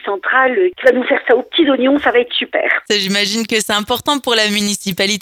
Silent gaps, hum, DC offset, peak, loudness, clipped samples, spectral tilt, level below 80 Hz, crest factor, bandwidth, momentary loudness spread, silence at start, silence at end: none; none; under 0.1%; 0 dBFS; -14 LUFS; under 0.1%; -3 dB/octave; -54 dBFS; 14 dB; 19.5 kHz; 4 LU; 0.05 s; 0 s